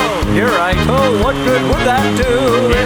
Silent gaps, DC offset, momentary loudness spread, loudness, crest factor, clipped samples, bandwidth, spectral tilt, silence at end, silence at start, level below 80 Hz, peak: none; under 0.1%; 2 LU; -13 LUFS; 12 dB; under 0.1%; over 20 kHz; -5.5 dB/octave; 0 s; 0 s; -24 dBFS; 0 dBFS